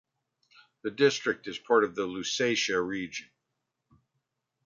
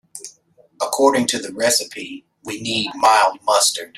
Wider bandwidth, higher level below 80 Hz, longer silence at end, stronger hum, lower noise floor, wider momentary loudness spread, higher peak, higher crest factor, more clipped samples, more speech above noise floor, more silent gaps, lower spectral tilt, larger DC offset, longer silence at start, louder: second, 7.6 kHz vs 16 kHz; second, -70 dBFS vs -64 dBFS; first, 1.45 s vs 0.1 s; neither; first, -83 dBFS vs -54 dBFS; second, 13 LU vs 20 LU; second, -10 dBFS vs -2 dBFS; about the same, 22 dB vs 18 dB; neither; first, 55 dB vs 36 dB; neither; first, -3 dB/octave vs -1.5 dB/octave; neither; first, 0.85 s vs 0.15 s; second, -28 LUFS vs -17 LUFS